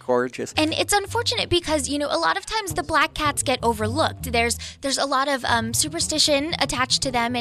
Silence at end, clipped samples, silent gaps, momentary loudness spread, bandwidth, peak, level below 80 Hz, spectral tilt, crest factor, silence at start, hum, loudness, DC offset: 0 s; under 0.1%; none; 4 LU; 15.5 kHz; -6 dBFS; -44 dBFS; -2.5 dB/octave; 18 dB; 0.05 s; none; -22 LUFS; under 0.1%